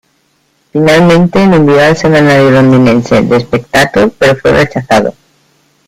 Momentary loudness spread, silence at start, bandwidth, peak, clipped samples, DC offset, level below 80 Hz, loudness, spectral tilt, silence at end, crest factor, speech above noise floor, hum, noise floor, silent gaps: 5 LU; 0.75 s; 16 kHz; 0 dBFS; 0.1%; under 0.1%; -36 dBFS; -7 LUFS; -6.5 dB/octave; 0.75 s; 8 dB; 48 dB; none; -55 dBFS; none